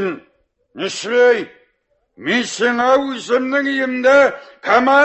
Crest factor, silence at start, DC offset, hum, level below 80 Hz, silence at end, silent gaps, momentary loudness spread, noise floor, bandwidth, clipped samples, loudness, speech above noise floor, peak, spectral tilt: 16 dB; 0 s; under 0.1%; none; -60 dBFS; 0 s; none; 14 LU; -65 dBFS; 8.4 kHz; under 0.1%; -16 LUFS; 50 dB; -2 dBFS; -3.5 dB/octave